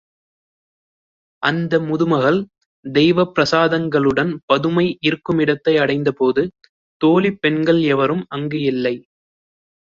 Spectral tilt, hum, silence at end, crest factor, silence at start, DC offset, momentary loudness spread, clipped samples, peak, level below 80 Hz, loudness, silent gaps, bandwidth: -6.5 dB/octave; none; 0.95 s; 16 dB; 1.4 s; under 0.1%; 7 LU; under 0.1%; -2 dBFS; -56 dBFS; -17 LUFS; 2.66-2.83 s, 4.43-4.48 s, 6.69-7.00 s; 7.4 kHz